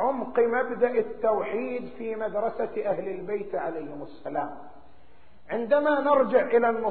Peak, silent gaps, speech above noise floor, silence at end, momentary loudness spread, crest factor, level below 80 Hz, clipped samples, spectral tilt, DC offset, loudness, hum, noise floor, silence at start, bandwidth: -10 dBFS; none; 32 dB; 0 s; 12 LU; 18 dB; -62 dBFS; under 0.1%; -4.5 dB/octave; 0.7%; -26 LUFS; none; -58 dBFS; 0 s; 4.5 kHz